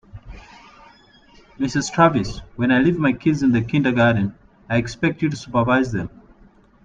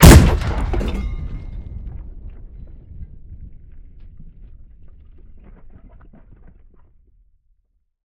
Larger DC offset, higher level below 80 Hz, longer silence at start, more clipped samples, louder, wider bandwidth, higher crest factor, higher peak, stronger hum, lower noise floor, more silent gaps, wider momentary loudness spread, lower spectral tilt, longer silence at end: neither; second, -46 dBFS vs -22 dBFS; first, 0.15 s vs 0 s; second, under 0.1% vs 0.7%; second, -20 LUFS vs -16 LUFS; second, 9.2 kHz vs 18 kHz; about the same, 20 dB vs 18 dB; about the same, -2 dBFS vs 0 dBFS; neither; second, -51 dBFS vs -66 dBFS; neither; second, 11 LU vs 26 LU; about the same, -6.5 dB/octave vs -5.5 dB/octave; second, 0.8 s vs 4.25 s